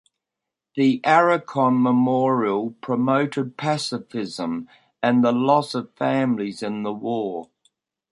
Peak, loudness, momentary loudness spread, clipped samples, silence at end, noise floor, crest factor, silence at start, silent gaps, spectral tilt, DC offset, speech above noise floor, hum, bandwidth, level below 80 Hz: -2 dBFS; -22 LUFS; 11 LU; under 0.1%; 0.65 s; -85 dBFS; 20 dB; 0.75 s; none; -6.5 dB/octave; under 0.1%; 64 dB; none; 11.5 kHz; -68 dBFS